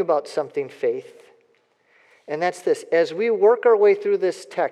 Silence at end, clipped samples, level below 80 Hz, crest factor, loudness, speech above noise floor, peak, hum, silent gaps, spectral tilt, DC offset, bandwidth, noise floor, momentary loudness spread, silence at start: 0 s; under 0.1%; under -90 dBFS; 16 dB; -21 LUFS; 42 dB; -6 dBFS; none; none; -5 dB/octave; under 0.1%; 11.5 kHz; -63 dBFS; 11 LU; 0 s